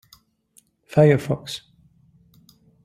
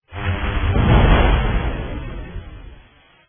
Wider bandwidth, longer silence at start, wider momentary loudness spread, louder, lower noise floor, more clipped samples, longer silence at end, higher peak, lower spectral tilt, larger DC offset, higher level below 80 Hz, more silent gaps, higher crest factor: first, 14 kHz vs 3.6 kHz; first, 0.95 s vs 0.1 s; about the same, 18 LU vs 20 LU; about the same, -20 LUFS vs -19 LUFS; first, -60 dBFS vs -49 dBFS; neither; first, 1.3 s vs 0.55 s; about the same, -2 dBFS vs -2 dBFS; second, -7 dB/octave vs -10.5 dB/octave; neither; second, -58 dBFS vs -22 dBFS; neither; first, 22 dB vs 16 dB